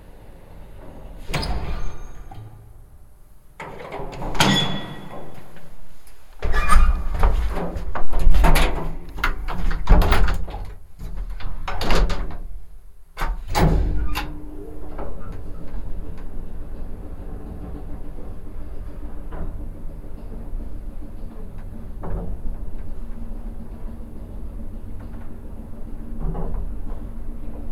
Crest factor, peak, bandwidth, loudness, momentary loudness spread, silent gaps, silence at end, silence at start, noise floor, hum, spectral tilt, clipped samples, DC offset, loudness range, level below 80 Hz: 20 dB; 0 dBFS; 18 kHz; -27 LUFS; 20 LU; none; 0 s; 0 s; -44 dBFS; none; -5 dB/octave; under 0.1%; under 0.1%; 14 LU; -24 dBFS